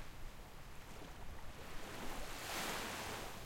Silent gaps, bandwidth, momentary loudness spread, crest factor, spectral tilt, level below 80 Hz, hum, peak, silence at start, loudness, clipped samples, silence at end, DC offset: none; 16.5 kHz; 14 LU; 16 dB; -2.5 dB/octave; -54 dBFS; none; -30 dBFS; 0 s; -47 LUFS; under 0.1%; 0 s; under 0.1%